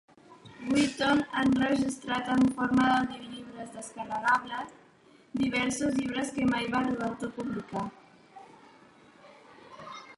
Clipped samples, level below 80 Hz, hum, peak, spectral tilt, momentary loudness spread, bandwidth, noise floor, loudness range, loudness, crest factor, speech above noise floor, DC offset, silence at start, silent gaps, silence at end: under 0.1%; -60 dBFS; none; -14 dBFS; -4.5 dB/octave; 16 LU; 11.5 kHz; -59 dBFS; 7 LU; -29 LUFS; 16 dB; 31 dB; under 0.1%; 0.3 s; none; 0.05 s